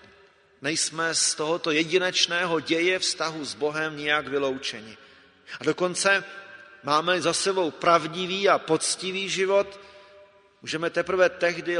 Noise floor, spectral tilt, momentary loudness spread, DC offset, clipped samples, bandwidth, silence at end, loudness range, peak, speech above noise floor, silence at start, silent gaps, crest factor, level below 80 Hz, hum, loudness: -57 dBFS; -2.5 dB/octave; 11 LU; under 0.1%; under 0.1%; 11 kHz; 0 s; 3 LU; -4 dBFS; 32 dB; 0.6 s; none; 22 dB; -68 dBFS; none; -24 LUFS